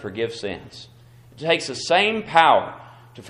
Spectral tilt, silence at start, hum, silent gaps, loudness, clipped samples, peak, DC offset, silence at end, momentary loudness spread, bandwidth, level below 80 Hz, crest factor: -3.5 dB/octave; 0 s; none; none; -20 LUFS; under 0.1%; 0 dBFS; under 0.1%; 0 s; 19 LU; 11 kHz; -60 dBFS; 22 dB